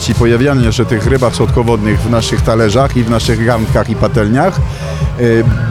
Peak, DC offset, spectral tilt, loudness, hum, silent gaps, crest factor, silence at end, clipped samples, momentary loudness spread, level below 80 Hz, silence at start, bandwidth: 0 dBFS; under 0.1%; -6.5 dB/octave; -12 LUFS; none; none; 10 dB; 0 s; under 0.1%; 3 LU; -22 dBFS; 0 s; 14 kHz